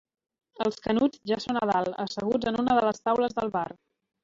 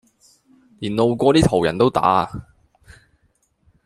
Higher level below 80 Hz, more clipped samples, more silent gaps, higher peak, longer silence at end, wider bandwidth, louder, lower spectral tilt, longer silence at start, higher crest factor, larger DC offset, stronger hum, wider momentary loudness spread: second, -60 dBFS vs -44 dBFS; neither; neither; second, -10 dBFS vs -2 dBFS; second, 0.55 s vs 1.45 s; second, 7.8 kHz vs 13 kHz; second, -27 LUFS vs -18 LUFS; about the same, -5.5 dB/octave vs -6.5 dB/octave; second, 0.6 s vs 0.8 s; about the same, 18 dB vs 20 dB; neither; neither; second, 7 LU vs 14 LU